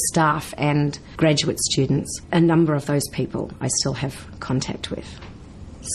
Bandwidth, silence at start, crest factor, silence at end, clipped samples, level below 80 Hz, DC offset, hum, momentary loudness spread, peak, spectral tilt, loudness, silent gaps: 13.5 kHz; 0 s; 16 dB; 0 s; under 0.1%; -44 dBFS; under 0.1%; none; 16 LU; -6 dBFS; -4.5 dB/octave; -22 LUFS; none